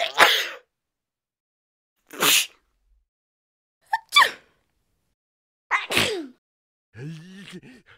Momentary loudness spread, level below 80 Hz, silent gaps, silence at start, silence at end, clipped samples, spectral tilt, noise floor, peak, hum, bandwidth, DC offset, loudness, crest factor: 24 LU; -64 dBFS; 1.40-1.96 s, 3.08-3.81 s, 5.14-5.70 s, 6.38-6.92 s; 0 s; 0.4 s; under 0.1%; -0.5 dB/octave; -88 dBFS; -2 dBFS; none; 16 kHz; under 0.1%; -20 LUFS; 26 dB